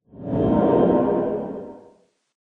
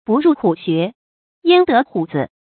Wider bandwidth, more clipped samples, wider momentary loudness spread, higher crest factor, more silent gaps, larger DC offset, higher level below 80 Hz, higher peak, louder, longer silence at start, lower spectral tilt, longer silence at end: second, 4 kHz vs 4.6 kHz; neither; first, 16 LU vs 10 LU; about the same, 16 dB vs 16 dB; second, none vs 0.95-1.42 s; neither; first, -46 dBFS vs -60 dBFS; second, -6 dBFS vs 0 dBFS; second, -20 LUFS vs -16 LUFS; about the same, 0.15 s vs 0.1 s; about the same, -11 dB/octave vs -11.5 dB/octave; first, 0.65 s vs 0.25 s